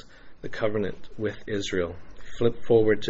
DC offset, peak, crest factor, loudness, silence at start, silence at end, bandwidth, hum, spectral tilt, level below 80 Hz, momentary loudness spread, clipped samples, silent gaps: under 0.1%; -8 dBFS; 18 dB; -27 LUFS; 0.05 s; 0 s; 8 kHz; none; -5 dB/octave; -48 dBFS; 19 LU; under 0.1%; none